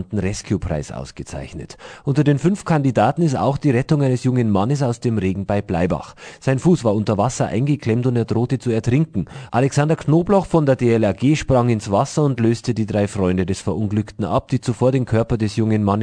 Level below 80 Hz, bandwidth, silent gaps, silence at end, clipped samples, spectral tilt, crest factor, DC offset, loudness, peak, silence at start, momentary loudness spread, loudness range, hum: -42 dBFS; 10 kHz; none; 0 s; under 0.1%; -7 dB/octave; 16 dB; under 0.1%; -19 LUFS; -2 dBFS; 0 s; 8 LU; 2 LU; none